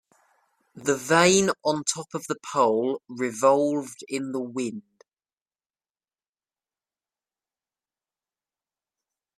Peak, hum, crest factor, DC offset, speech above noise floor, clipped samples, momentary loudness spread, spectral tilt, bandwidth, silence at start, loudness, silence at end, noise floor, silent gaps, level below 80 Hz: -4 dBFS; none; 24 dB; under 0.1%; over 66 dB; under 0.1%; 13 LU; -3.5 dB/octave; 14.5 kHz; 0.75 s; -24 LUFS; 4.6 s; under -90 dBFS; none; -68 dBFS